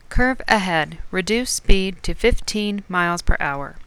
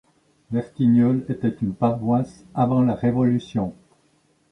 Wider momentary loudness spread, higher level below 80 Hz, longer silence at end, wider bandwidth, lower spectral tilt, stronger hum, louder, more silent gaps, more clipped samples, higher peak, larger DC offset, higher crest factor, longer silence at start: second, 7 LU vs 10 LU; first, -24 dBFS vs -54 dBFS; second, 0.05 s vs 0.8 s; first, 13.5 kHz vs 6.2 kHz; second, -4 dB/octave vs -9.5 dB/octave; neither; about the same, -21 LUFS vs -22 LUFS; neither; neither; first, 0 dBFS vs -6 dBFS; neither; about the same, 20 dB vs 16 dB; second, 0.1 s vs 0.5 s